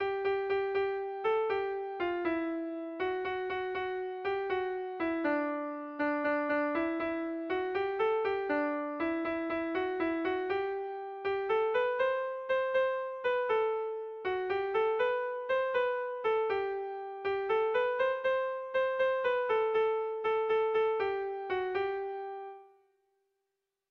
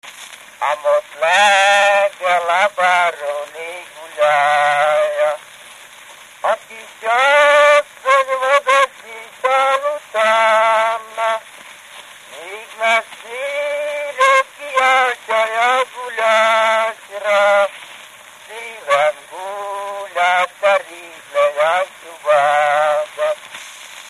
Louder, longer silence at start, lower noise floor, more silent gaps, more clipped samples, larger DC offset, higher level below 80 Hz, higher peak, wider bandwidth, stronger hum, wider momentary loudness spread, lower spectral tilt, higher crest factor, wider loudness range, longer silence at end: second, -32 LUFS vs -15 LUFS; about the same, 0 s vs 0.05 s; first, -86 dBFS vs -40 dBFS; neither; neither; neither; about the same, -68 dBFS vs -72 dBFS; second, -20 dBFS vs 0 dBFS; second, 6 kHz vs 14.5 kHz; neither; second, 6 LU vs 19 LU; first, -6 dB/octave vs 0 dB/octave; about the same, 12 dB vs 16 dB; about the same, 4 LU vs 5 LU; first, 1.25 s vs 0 s